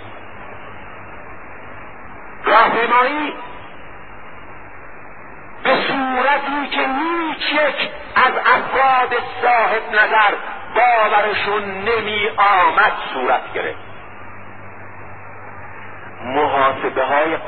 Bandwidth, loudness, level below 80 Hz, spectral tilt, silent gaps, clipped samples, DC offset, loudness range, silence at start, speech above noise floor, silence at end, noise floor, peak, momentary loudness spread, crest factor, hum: 4.7 kHz; -16 LUFS; -50 dBFS; -8 dB/octave; none; under 0.1%; 2%; 8 LU; 0 s; 21 dB; 0 s; -38 dBFS; 0 dBFS; 23 LU; 18 dB; none